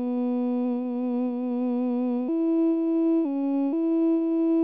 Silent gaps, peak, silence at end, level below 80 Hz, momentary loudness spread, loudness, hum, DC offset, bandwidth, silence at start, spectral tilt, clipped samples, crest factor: none; -18 dBFS; 0 s; -82 dBFS; 4 LU; -25 LUFS; none; 0.2%; 3.6 kHz; 0 s; -7 dB/octave; under 0.1%; 8 dB